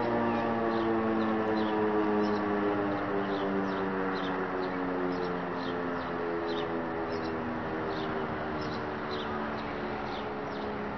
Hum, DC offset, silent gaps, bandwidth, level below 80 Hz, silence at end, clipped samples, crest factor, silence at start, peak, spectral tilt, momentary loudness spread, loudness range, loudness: none; 0.2%; none; 6.4 kHz; -56 dBFS; 0 s; under 0.1%; 14 dB; 0 s; -16 dBFS; -7.5 dB/octave; 6 LU; 5 LU; -32 LUFS